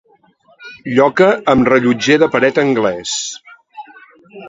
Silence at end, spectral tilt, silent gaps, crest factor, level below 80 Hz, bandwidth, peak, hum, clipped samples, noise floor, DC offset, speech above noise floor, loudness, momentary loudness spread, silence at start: 0 s; -4.5 dB/octave; none; 16 dB; -50 dBFS; 8 kHz; 0 dBFS; none; under 0.1%; -52 dBFS; under 0.1%; 39 dB; -13 LUFS; 11 LU; 0.6 s